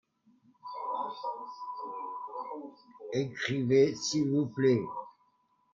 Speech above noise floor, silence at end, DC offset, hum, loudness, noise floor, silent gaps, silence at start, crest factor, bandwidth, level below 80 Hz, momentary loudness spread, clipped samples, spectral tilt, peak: 42 dB; 0.65 s; under 0.1%; none; -32 LUFS; -71 dBFS; none; 0.65 s; 18 dB; 7.6 kHz; -74 dBFS; 18 LU; under 0.1%; -5.5 dB/octave; -14 dBFS